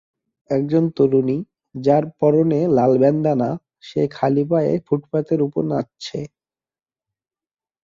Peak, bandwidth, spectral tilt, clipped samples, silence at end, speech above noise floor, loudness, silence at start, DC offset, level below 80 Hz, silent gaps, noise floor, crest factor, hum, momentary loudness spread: -2 dBFS; 7.6 kHz; -8.5 dB/octave; under 0.1%; 1.55 s; over 72 dB; -19 LUFS; 0.5 s; under 0.1%; -60 dBFS; none; under -90 dBFS; 18 dB; none; 13 LU